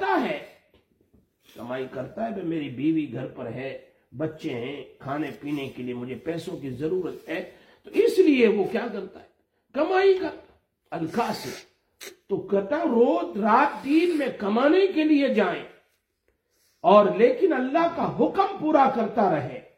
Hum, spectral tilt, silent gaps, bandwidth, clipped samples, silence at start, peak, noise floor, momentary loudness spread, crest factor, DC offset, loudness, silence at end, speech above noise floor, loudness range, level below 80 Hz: none; -6.5 dB/octave; none; 16 kHz; under 0.1%; 0 s; -4 dBFS; -72 dBFS; 15 LU; 22 dB; under 0.1%; -24 LUFS; 0.15 s; 49 dB; 10 LU; -66 dBFS